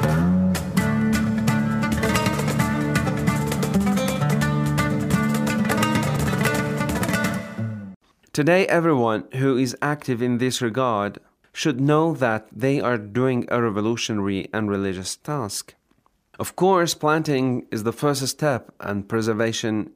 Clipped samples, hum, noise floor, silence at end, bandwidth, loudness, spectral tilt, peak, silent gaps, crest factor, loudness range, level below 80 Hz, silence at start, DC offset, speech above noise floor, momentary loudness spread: under 0.1%; none; -64 dBFS; 0.05 s; 16 kHz; -22 LUFS; -5.5 dB/octave; -6 dBFS; 7.96-8.00 s; 16 dB; 2 LU; -46 dBFS; 0 s; under 0.1%; 42 dB; 8 LU